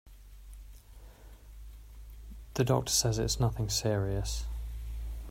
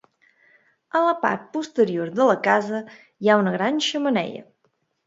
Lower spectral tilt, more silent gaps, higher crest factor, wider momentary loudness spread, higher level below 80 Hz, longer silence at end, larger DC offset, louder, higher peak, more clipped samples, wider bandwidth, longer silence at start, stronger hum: about the same, -4 dB/octave vs -5 dB/octave; neither; about the same, 20 dB vs 20 dB; first, 25 LU vs 11 LU; first, -42 dBFS vs -72 dBFS; second, 0 s vs 0.65 s; neither; second, -31 LUFS vs -22 LUFS; second, -14 dBFS vs -4 dBFS; neither; first, 16 kHz vs 7.8 kHz; second, 0.05 s vs 0.95 s; neither